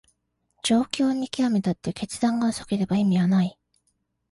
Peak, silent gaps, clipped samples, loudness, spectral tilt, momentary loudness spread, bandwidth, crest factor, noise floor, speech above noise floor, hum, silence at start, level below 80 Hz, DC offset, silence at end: -6 dBFS; none; under 0.1%; -24 LUFS; -6 dB/octave; 8 LU; 11.5 kHz; 18 dB; -73 dBFS; 50 dB; none; 0.65 s; -58 dBFS; under 0.1%; 0.8 s